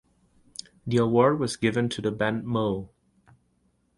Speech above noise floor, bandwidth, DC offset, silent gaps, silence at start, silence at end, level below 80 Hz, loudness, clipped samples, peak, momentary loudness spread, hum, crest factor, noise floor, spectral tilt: 44 dB; 11.5 kHz; under 0.1%; none; 0.85 s; 1.1 s; -58 dBFS; -25 LUFS; under 0.1%; -6 dBFS; 20 LU; none; 20 dB; -69 dBFS; -6 dB/octave